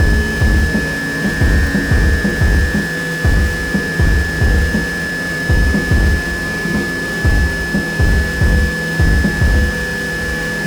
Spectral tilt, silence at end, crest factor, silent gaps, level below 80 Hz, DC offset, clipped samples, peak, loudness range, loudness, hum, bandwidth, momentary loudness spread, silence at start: -5.5 dB/octave; 0 s; 12 dB; none; -18 dBFS; under 0.1%; under 0.1%; -2 dBFS; 1 LU; -15 LUFS; none; over 20 kHz; 4 LU; 0 s